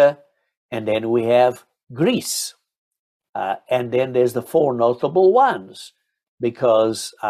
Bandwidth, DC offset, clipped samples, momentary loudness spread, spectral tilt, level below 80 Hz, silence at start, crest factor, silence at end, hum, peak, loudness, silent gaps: 15 kHz; under 0.1%; under 0.1%; 16 LU; -5 dB/octave; -66 dBFS; 0 s; 16 dB; 0 s; none; -4 dBFS; -19 LUFS; 0.57-0.69 s, 1.83-1.87 s, 2.77-2.91 s, 2.99-3.20 s, 3.29-3.33 s, 6.28-6.38 s